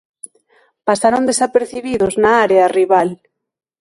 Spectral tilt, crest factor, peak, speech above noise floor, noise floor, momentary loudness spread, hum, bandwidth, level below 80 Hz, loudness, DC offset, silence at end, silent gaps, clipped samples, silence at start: -4 dB/octave; 16 dB; 0 dBFS; 65 dB; -79 dBFS; 9 LU; none; 11.5 kHz; -52 dBFS; -14 LUFS; under 0.1%; 0.65 s; none; under 0.1%; 0.85 s